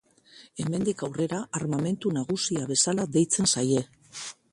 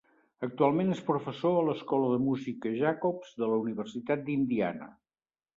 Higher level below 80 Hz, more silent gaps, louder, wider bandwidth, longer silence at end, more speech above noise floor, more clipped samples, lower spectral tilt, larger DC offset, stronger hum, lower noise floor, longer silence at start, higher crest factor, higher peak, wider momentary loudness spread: first, -64 dBFS vs -72 dBFS; neither; first, -26 LUFS vs -30 LUFS; first, 11.5 kHz vs 7.6 kHz; second, 0.2 s vs 0.65 s; second, 28 dB vs over 60 dB; neither; second, -4 dB/octave vs -8 dB/octave; neither; neither; second, -54 dBFS vs under -90 dBFS; about the same, 0.35 s vs 0.4 s; about the same, 18 dB vs 20 dB; about the same, -10 dBFS vs -10 dBFS; first, 16 LU vs 8 LU